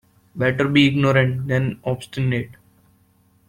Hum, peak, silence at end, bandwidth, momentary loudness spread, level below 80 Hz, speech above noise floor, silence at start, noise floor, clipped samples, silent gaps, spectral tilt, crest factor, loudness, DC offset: none; -2 dBFS; 0.95 s; 11 kHz; 11 LU; -52 dBFS; 39 dB; 0.35 s; -58 dBFS; under 0.1%; none; -7 dB/octave; 18 dB; -20 LUFS; under 0.1%